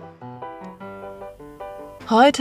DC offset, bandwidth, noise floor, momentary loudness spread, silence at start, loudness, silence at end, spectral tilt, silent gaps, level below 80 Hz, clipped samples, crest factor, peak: under 0.1%; 15 kHz; -39 dBFS; 23 LU; 0.05 s; -17 LUFS; 0 s; -4 dB/octave; none; -56 dBFS; under 0.1%; 20 dB; -2 dBFS